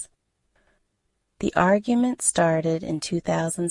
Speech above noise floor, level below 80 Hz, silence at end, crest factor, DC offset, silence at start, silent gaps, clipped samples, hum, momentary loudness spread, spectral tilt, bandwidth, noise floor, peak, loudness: 52 dB; -54 dBFS; 0 s; 20 dB; under 0.1%; 0 s; none; under 0.1%; none; 7 LU; -5 dB/octave; 11.5 kHz; -74 dBFS; -6 dBFS; -23 LUFS